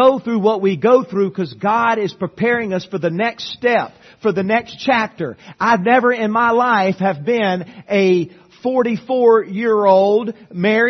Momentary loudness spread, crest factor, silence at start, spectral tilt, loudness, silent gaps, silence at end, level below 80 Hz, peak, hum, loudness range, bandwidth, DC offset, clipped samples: 9 LU; 16 dB; 0 s; -6.5 dB/octave; -16 LUFS; none; 0 s; -62 dBFS; 0 dBFS; none; 3 LU; 6.4 kHz; under 0.1%; under 0.1%